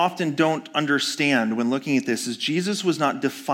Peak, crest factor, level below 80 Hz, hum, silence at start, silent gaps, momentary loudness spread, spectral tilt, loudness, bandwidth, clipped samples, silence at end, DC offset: -6 dBFS; 16 dB; -78 dBFS; none; 0 s; none; 4 LU; -4 dB/octave; -23 LUFS; 17 kHz; under 0.1%; 0 s; under 0.1%